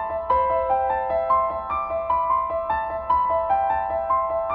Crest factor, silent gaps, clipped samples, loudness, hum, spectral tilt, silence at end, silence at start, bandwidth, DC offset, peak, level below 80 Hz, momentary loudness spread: 12 dB; none; under 0.1%; -23 LUFS; none; -8.5 dB/octave; 0 s; 0 s; 4.8 kHz; under 0.1%; -10 dBFS; -46 dBFS; 5 LU